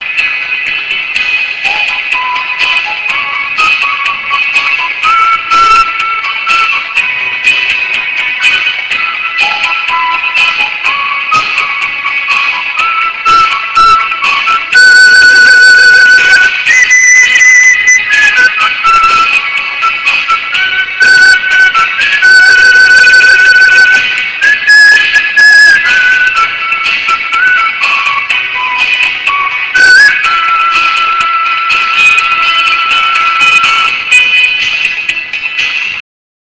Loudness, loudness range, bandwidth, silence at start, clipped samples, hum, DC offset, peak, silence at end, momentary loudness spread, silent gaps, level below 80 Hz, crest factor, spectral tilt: -5 LUFS; 6 LU; 8 kHz; 0 s; 7%; none; 0.5%; 0 dBFS; 0.45 s; 9 LU; none; -44 dBFS; 8 dB; 1.5 dB/octave